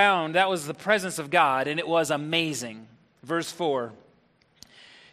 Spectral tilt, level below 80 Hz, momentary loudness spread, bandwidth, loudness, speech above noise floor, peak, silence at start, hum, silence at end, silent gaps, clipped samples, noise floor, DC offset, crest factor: -3.5 dB/octave; -70 dBFS; 10 LU; 14.5 kHz; -25 LUFS; 38 dB; -6 dBFS; 0 s; none; 1.2 s; none; under 0.1%; -63 dBFS; under 0.1%; 22 dB